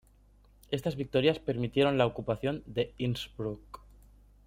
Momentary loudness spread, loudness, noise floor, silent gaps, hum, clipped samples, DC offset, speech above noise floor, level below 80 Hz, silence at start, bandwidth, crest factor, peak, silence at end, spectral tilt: 11 LU; -31 LUFS; -61 dBFS; none; 50 Hz at -55 dBFS; under 0.1%; under 0.1%; 30 dB; -56 dBFS; 0.7 s; 16 kHz; 20 dB; -12 dBFS; 0.7 s; -7 dB/octave